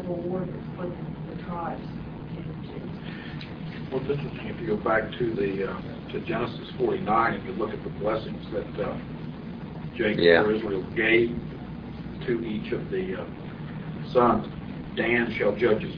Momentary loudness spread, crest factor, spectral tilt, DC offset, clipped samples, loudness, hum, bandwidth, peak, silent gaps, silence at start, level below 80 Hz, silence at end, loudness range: 15 LU; 22 dB; -9 dB/octave; under 0.1%; under 0.1%; -28 LUFS; none; 5.4 kHz; -4 dBFS; none; 0 s; -48 dBFS; 0 s; 9 LU